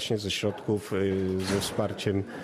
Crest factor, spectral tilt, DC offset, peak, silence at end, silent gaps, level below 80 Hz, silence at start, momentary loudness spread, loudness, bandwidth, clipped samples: 16 dB; -5 dB/octave; under 0.1%; -12 dBFS; 0 s; none; -58 dBFS; 0 s; 2 LU; -29 LUFS; 15 kHz; under 0.1%